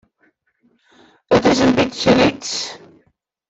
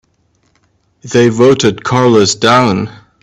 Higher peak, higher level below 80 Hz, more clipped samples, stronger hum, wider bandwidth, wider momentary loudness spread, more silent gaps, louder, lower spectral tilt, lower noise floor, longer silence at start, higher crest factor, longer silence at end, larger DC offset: about the same, -2 dBFS vs 0 dBFS; about the same, -48 dBFS vs -48 dBFS; neither; neither; second, 8.2 kHz vs 11 kHz; first, 10 LU vs 7 LU; neither; second, -16 LUFS vs -10 LUFS; about the same, -4.5 dB/octave vs -5 dB/octave; first, -63 dBFS vs -57 dBFS; first, 1.3 s vs 1.05 s; first, 18 dB vs 12 dB; first, 0.7 s vs 0.3 s; neither